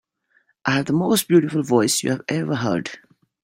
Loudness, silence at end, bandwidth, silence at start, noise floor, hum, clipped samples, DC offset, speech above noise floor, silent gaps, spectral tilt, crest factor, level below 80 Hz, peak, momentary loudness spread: -20 LUFS; 0.45 s; 16 kHz; 0.65 s; -64 dBFS; none; under 0.1%; under 0.1%; 44 dB; none; -4.5 dB/octave; 18 dB; -60 dBFS; -2 dBFS; 8 LU